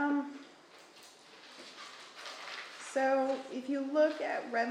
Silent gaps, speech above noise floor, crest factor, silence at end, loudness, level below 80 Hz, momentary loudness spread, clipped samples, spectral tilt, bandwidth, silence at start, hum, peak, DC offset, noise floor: none; 25 dB; 18 dB; 0 s; -34 LUFS; -90 dBFS; 24 LU; under 0.1%; -3 dB/octave; 11.5 kHz; 0 s; none; -18 dBFS; under 0.1%; -57 dBFS